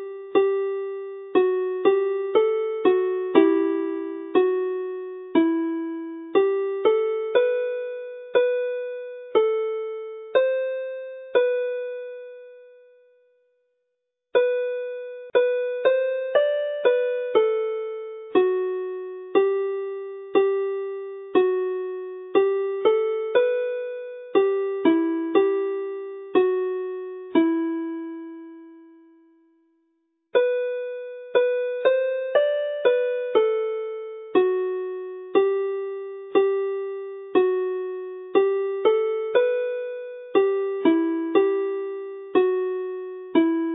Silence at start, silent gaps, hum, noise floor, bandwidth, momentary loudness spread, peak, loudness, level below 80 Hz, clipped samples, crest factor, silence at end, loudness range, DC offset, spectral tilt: 0 s; none; none; -79 dBFS; 4 kHz; 12 LU; -2 dBFS; -24 LUFS; -80 dBFS; under 0.1%; 22 dB; 0 s; 5 LU; under 0.1%; -9 dB/octave